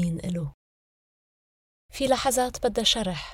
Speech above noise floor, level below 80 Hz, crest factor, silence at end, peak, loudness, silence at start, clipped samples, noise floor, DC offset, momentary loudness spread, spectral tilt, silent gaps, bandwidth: over 65 dB; -48 dBFS; 20 dB; 0 s; -8 dBFS; -25 LUFS; 0 s; under 0.1%; under -90 dBFS; under 0.1%; 12 LU; -3.5 dB/octave; 0.54-1.89 s; 17.5 kHz